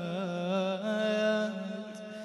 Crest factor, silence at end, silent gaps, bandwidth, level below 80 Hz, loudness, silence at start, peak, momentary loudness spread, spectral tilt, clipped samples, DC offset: 14 dB; 0 s; none; 11.5 kHz; -80 dBFS; -32 LUFS; 0 s; -18 dBFS; 11 LU; -6 dB/octave; under 0.1%; under 0.1%